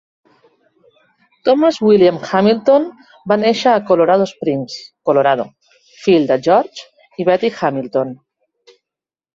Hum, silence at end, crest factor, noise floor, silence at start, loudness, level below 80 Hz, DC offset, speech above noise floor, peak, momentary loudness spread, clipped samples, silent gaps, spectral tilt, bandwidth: none; 1.2 s; 16 dB; -87 dBFS; 1.45 s; -15 LUFS; -60 dBFS; under 0.1%; 73 dB; 0 dBFS; 14 LU; under 0.1%; none; -6 dB/octave; 7.6 kHz